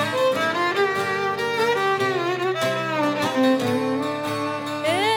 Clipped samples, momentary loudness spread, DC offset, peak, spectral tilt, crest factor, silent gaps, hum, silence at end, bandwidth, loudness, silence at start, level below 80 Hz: under 0.1%; 5 LU; under 0.1%; -8 dBFS; -4.5 dB/octave; 14 dB; none; none; 0 s; 18.5 kHz; -22 LUFS; 0 s; -70 dBFS